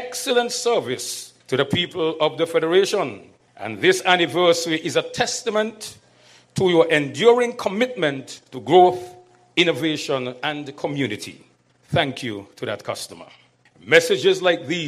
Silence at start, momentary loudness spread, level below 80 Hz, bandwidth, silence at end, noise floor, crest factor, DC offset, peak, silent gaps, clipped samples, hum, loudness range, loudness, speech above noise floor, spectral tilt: 0 s; 16 LU; -62 dBFS; 15 kHz; 0 s; -53 dBFS; 22 dB; under 0.1%; 0 dBFS; none; under 0.1%; none; 7 LU; -20 LUFS; 32 dB; -4 dB/octave